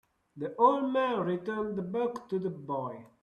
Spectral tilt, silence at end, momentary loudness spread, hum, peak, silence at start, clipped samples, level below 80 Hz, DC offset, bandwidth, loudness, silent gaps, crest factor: -8 dB/octave; 0.15 s; 12 LU; none; -10 dBFS; 0.35 s; under 0.1%; -72 dBFS; under 0.1%; 10 kHz; -31 LUFS; none; 20 dB